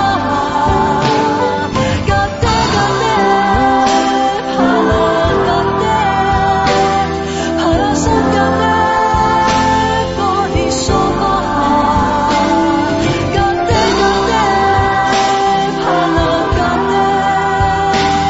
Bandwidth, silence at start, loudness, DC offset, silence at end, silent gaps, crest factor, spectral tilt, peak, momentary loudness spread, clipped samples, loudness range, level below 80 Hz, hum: 8 kHz; 0 s; -13 LUFS; under 0.1%; 0 s; none; 12 dB; -5 dB/octave; 0 dBFS; 3 LU; under 0.1%; 1 LU; -28 dBFS; none